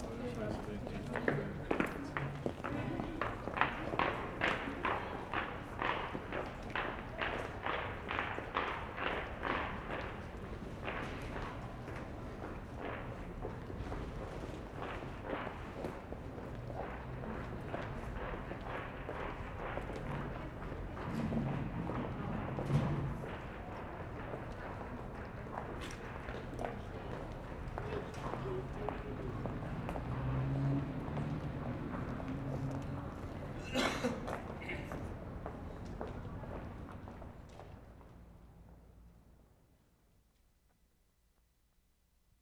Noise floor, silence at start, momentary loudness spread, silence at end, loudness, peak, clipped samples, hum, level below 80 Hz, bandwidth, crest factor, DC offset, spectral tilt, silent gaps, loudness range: -73 dBFS; 0 s; 10 LU; 3 s; -41 LUFS; -10 dBFS; under 0.1%; none; -50 dBFS; 15 kHz; 30 dB; under 0.1%; -6.5 dB/octave; none; 7 LU